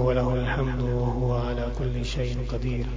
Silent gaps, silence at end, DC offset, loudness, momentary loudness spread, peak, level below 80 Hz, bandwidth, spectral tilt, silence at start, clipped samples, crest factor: none; 0 s; under 0.1%; -27 LUFS; 4 LU; -10 dBFS; -30 dBFS; 7.6 kHz; -7.5 dB/octave; 0 s; under 0.1%; 14 dB